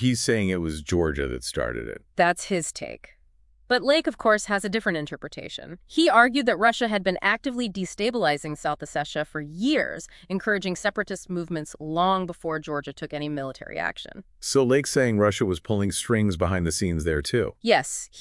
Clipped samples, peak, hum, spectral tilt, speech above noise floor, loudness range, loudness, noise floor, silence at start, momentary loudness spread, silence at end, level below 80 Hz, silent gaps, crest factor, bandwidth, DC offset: under 0.1%; -4 dBFS; none; -4.5 dB/octave; 34 dB; 5 LU; -25 LUFS; -59 dBFS; 0 s; 12 LU; 0 s; -48 dBFS; none; 22 dB; 12 kHz; under 0.1%